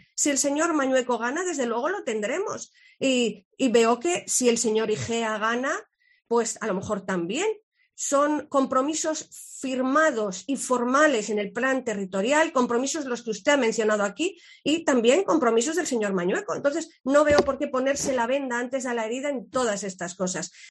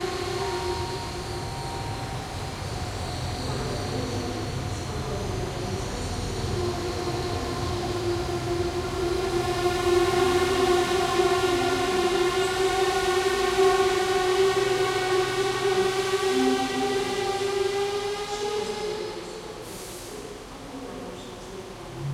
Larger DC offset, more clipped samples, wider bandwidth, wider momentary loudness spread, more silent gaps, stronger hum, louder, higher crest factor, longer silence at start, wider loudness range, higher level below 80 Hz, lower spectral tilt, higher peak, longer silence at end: neither; neither; second, 12 kHz vs 16 kHz; second, 9 LU vs 14 LU; first, 3.45-3.51 s, 7.63-7.72 s vs none; neither; about the same, -25 LUFS vs -26 LUFS; about the same, 18 dB vs 16 dB; first, 0.15 s vs 0 s; second, 3 LU vs 8 LU; second, -60 dBFS vs -42 dBFS; second, -3 dB/octave vs -4.5 dB/octave; about the same, -8 dBFS vs -10 dBFS; about the same, 0 s vs 0 s